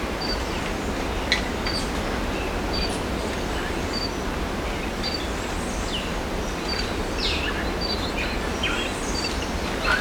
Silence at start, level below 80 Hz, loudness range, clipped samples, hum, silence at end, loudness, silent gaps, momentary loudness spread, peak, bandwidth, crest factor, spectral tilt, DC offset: 0 s; -32 dBFS; 2 LU; under 0.1%; none; 0 s; -26 LUFS; none; 4 LU; -6 dBFS; over 20 kHz; 20 dB; -4 dB/octave; under 0.1%